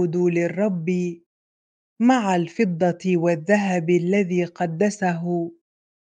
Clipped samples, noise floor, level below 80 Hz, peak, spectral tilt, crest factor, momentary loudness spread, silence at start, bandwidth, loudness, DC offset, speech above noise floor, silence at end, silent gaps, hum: under 0.1%; under -90 dBFS; -72 dBFS; -4 dBFS; -7 dB/octave; 18 dB; 6 LU; 0 s; 9.2 kHz; -22 LUFS; under 0.1%; over 69 dB; 0.5 s; 1.26-1.96 s; none